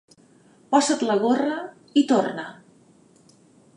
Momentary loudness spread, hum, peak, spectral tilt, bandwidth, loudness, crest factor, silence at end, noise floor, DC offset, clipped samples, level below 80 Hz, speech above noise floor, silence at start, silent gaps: 13 LU; none; -6 dBFS; -4 dB/octave; 11 kHz; -22 LUFS; 18 dB; 1.25 s; -55 dBFS; under 0.1%; under 0.1%; -78 dBFS; 34 dB; 0.7 s; none